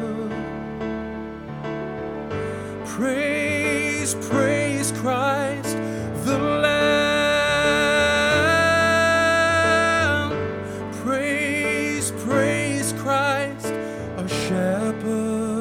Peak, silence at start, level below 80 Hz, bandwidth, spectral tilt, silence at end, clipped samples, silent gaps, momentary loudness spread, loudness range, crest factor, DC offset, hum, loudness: -6 dBFS; 0 s; -48 dBFS; 19 kHz; -4 dB/octave; 0 s; under 0.1%; none; 12 LU; 7 LU; 16 dB; under 0.1%; none; -21 LUFS